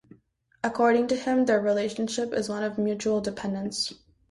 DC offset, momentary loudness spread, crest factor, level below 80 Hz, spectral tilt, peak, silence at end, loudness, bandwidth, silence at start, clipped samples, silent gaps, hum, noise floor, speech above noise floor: under 0.1%; 9 LU; 16 dB; -62 dBFS; -4.5 dB/octave; -10 dBFS; 0.35 s; -26 LUFS; 11.5 kHz; 0.65 s; under 0.1%; none; none; -64 dBFS; 38 dB